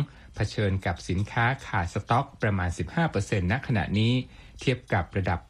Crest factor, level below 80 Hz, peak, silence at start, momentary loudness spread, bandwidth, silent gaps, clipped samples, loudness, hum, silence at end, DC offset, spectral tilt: 16 dB; -46 dBFS; -10 dBFS; 0 s; 5 LU; 11 kHz; none; under 0.1%; -28 LUFS; none; 0.05 s; under 0.1%; -6.5 dB/octave